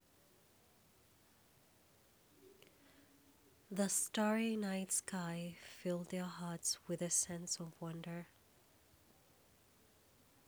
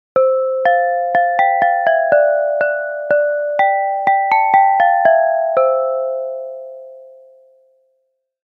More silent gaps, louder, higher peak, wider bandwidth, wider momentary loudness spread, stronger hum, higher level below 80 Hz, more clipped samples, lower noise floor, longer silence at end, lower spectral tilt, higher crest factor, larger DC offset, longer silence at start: neither; second, -40 LUFS vs -15 LUFS; second, -24 dBFS vs 0 dBFS; first, over 20 kHz vs 5 kHz; about the same, 12 LU vs 10 LU; neither; second, -82 dBFS vs -72 dBFS; neither; about the same, -70 dBFS vs -68 dBFS; first, 2.2 s vs 1.4 s; second, -3.5 dB/octave vs -5.5 dB/octave; about the same, 20 dB vs 16 dB; neither; first, 2.4 s vs 0.15 s